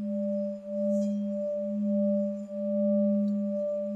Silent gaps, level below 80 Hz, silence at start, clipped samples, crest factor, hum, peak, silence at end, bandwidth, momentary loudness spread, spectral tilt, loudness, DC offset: none; -74 dBFS; 0 s; under 0.1%; 10 dB; none; -18 dBFS; 0 s; 7.6 kHz; 6 LU; -10.5 dB/octave; -29 LUFS; under 0.1%